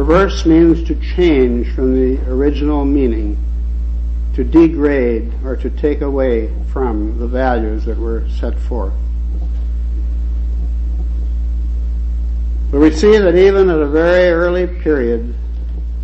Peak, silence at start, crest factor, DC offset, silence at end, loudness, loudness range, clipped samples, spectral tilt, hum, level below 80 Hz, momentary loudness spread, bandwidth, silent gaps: 0 dBFS; 0 s; 12 dB; under 0.1%; 0 s; -15 LUFS; 8 LU; under 0.1%; -8 dB/octave; none; -18 dBFS; 11 LU; 7.6 kHz; none